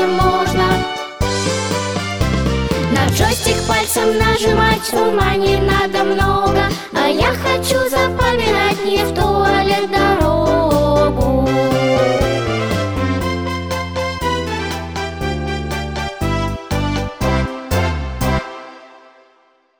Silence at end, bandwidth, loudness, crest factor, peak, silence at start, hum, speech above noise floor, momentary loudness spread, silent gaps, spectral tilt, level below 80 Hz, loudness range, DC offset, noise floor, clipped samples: 0.85 s; over 20 kHz; -16 LUFS; 14 dB; -2 dBFS; 0 s; none; 40 dB; 8 LU; none; -5 dB/octave; -28 dBFS; 6 LU; under 0.1%; -55 dBFS; under 0.1%